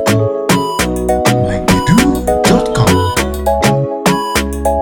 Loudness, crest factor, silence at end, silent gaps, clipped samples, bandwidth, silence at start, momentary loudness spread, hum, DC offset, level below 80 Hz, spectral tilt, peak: -13 LUFS; 12 dB; 0 s; none; under 0.1%; 19 kHz; 0 s; 4 LU; none; under 0.1%; -26 dBFS; -5 dB/octave; 0 dBFS